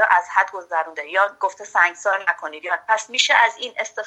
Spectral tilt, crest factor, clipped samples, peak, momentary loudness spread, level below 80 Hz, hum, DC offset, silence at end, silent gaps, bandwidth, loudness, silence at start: 1.5 dB/octave; 18 dB; under 0.1%; -2 dBFS; 10 LU; -74 dBFS; none; under 0.1%; 0 s; none; 11 kHz; -20 LUFS; 0 s